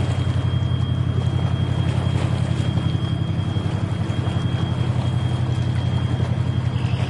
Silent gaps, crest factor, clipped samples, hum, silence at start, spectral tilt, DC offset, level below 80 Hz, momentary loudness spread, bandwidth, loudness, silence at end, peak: none; 12 dB; under 0.1%; none; 0 s; -7.5 dB/octave; 0.2%; -42 dBFS; 2 LU; 10.5 kHz; -22 LUFS; 0 s; -10 dBFS